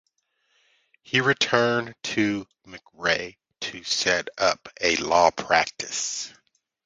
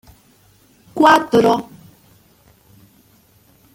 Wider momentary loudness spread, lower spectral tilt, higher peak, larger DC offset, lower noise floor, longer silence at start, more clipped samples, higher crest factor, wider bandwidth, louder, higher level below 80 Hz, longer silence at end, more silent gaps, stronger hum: second, 13 LU vs 22 LU; second, -2.5 dB/octave vs -5 dB/octave; about the same, -2 dBFS vs 0 dBFS; neither; first, -72 dBFS vs -53 dBFS; first, 1.1 s vs 0.95 s; neither; about the same, 24 dB vs 20 dB; second, 10 kHz vs 17 kHz; second, -24 LUFS vs -14 LUFS; about the same, -60 dBFS vs -56 dBFS; second, 0.55 s vs 2.1 s; neither; neither